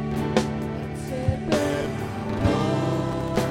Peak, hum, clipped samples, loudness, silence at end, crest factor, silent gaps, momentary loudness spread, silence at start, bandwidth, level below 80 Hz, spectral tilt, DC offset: -4 dBFS; none; under 0.1%; -26 LUFS; 0 s; 22 dB; none; 7 LU; 0 s; 17 kHz; -40 dBFS; -6.5 dB/octave; under 0.1%